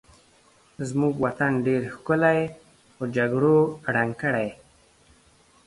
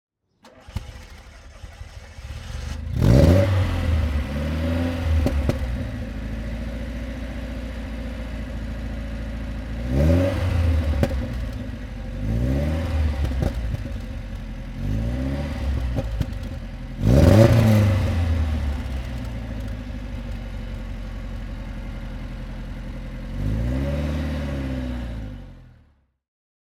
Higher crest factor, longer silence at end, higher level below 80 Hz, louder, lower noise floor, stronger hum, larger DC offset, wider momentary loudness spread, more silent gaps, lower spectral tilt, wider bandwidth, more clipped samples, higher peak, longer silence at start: about the same, 18 dB vs 22 dB; about the same, 1.15 s vs 1.1 s; second, -60 dBFS vs -28 dBFS; about the same, -24 LUFS vs -24 LUFS; about the same, -58 dBFS vs -58 dBFS; neither; neither; second, 11 LU vs 17 LU; neither; about the same, -7.5 dB/octave vs -7.5 dB/octave; second, 11.5 kHz vs 15 kHz; neither; second, -8 dBFS vs 0 dBFS; first, 0.8 s vs 0.45 s